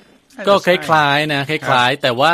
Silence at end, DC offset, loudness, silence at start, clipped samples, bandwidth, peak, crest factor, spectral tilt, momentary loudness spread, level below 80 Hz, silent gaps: 0 s; under 0.1%; -15 LUFS; 0.4 s; under 0.1%; 15.5 kHz; 0 dBFS; 16 dB; -4.5 dB/octave; 5 LU; -58 dBFS; none